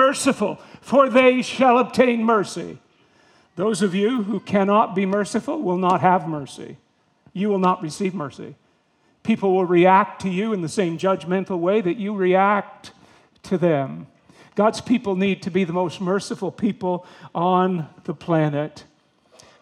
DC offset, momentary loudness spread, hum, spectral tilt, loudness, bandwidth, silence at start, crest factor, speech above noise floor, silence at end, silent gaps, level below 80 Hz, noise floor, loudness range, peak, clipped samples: under 0.1%; 15 LU; none; -6 dB/octave; -20 LUFS; 12.5 kHz; 0 s; 20 dB; 42 dB; 0.8 s; none; -66 dBFS; -63 dBFS; 4 LU; -2 dBFS; under 0.1%